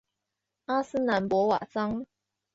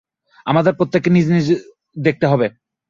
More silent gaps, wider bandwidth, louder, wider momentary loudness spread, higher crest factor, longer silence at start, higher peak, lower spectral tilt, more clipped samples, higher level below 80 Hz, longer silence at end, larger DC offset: neither; about the same, 8 kHz vs 7.4 kHz; second, -28 LUFS vs -17 LUFS; first, 14 LU vs 8 LU; about the same, 16 dB vs 16 dB; first, 0.7 s vs 0.45 s; second, -12 dBFS vs -2 dBFS; second, -6.5 dB/octave vs -8 dB/octave; neither; second, -62 dBFS vs -54 dBFS; about the same, 0.5 s vs 0.4 s; neither